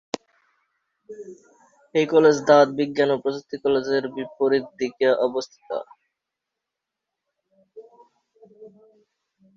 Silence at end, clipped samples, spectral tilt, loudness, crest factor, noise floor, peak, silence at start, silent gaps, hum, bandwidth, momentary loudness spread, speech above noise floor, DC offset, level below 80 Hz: 0.9 s; under 0.1%; -5 dB/octave; -21 LUFS; 22 dB; -85 dBFS; -4 dBFS; 1.1 s; none; none; 7.6 kHz; 19 LU; 64 dB; under 0.1%; -70 dBFS